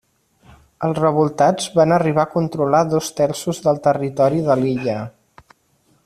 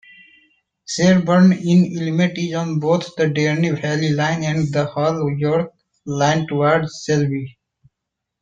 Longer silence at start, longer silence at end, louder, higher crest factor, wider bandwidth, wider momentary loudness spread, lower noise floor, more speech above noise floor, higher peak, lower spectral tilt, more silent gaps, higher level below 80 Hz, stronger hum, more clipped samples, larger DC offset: about the same, 0.8 s vs 0.9 s; about the same, 0.95 s vs 0.9 s; about the same, -18 LUFS vs -18 LUFS; about the same, 16 dB vs 16 dB; first, 14 kHz vs 7.8 kHz; about the same, 7 LU vs 9 LU; second, -60 dBFS vs -81 dBFS; second, 43 dB vs 63 dB; about the same, -2 dBFS vs -2 dBFS; about the same, -6 dB/octave vs -6.5 dB/octave; neither; about the same, -56 dBFS vs -56 dBFS; neither; neither; neither